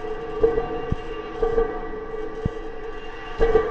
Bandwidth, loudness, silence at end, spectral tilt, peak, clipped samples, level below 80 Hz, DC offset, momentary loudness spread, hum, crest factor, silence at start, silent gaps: 7 kHz; -26 LUFS; 0 s; -7.5 dB/octave; -6 dBFS; under 0.1%; -32 dBFS; under 0.1%; 13 LU; none; 18 dB; 0 s; none